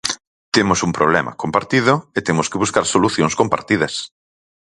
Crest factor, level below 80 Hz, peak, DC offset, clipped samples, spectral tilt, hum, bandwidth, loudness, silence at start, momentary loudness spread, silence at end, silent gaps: 18 dB; -48 dBFS; 0 dBFS; under 0.1%; under 0.1%; -4 dB/octave; none; 11.5 kHz; -17 LUFS; 0.05 s; 7 LU; 0.7 s; 0.27-0.52 s